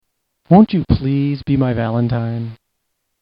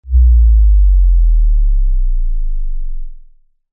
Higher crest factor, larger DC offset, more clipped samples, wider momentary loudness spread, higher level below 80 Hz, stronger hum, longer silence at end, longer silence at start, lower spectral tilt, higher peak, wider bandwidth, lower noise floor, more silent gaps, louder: first, 16 dB vs 8 dB; neither; neither; second, 12 LU vs 16 LU; second, -36 dBFS vs -10 dBFS; neither; first, 0.7 s vs 0.55 s; first, 0.5 s vs 0.05 s; second, -11.5 dB/octave vs -15 dB/octave; about the same, 0 dBFS vs -2 dBFS; first, 5.4 kHz vs 0.2 kHz; first, -72 dBFS vs -43 dBFS; neither; about the same, -16 LUFS vs -14 LUFS